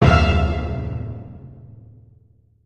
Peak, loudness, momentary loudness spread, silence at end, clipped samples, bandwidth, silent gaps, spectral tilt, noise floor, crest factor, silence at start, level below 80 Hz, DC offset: -2 dBFS; -21 LUFS; 25 LU; 0.9 s; under 0.1%; 8.2 kHz; none; -7.5 dB/octave; -55 dBFS; 20 dB; 0 s; -26 dBFS; under 0.1%